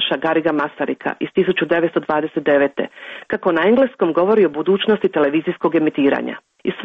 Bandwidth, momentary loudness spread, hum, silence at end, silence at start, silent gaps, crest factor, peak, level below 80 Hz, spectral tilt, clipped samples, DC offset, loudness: 5.2 kHz; 10 LU; none; 0 s; 0 s; none; 12 dB; -4 dBFS; -60 dBFS; -8 dB/octave; under 0.1%; under 0.1%; -18 LUFS